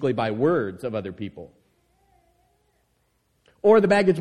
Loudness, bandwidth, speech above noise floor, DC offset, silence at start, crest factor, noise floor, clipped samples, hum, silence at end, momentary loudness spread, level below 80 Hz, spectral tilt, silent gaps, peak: -22 LUFS; 10.5 kHz; 48 dB; under 0.1%; 0 s; 20 dB; -69 dBFS; under 0.1%; none; 0 s; 20 LU; -62 dBFS; -7 dB/octave; none; -4 dBFS